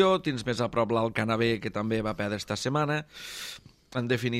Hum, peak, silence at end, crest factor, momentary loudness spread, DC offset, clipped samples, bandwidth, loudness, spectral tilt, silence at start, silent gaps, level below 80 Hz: none; -10 dBFS; 0 s; 18 dB; 11 LU; under 0.1%; under 0.1%; 15.5 kHz; -29 LUFS; -5.5 dB/octave; 0 s; none; -56 dBFS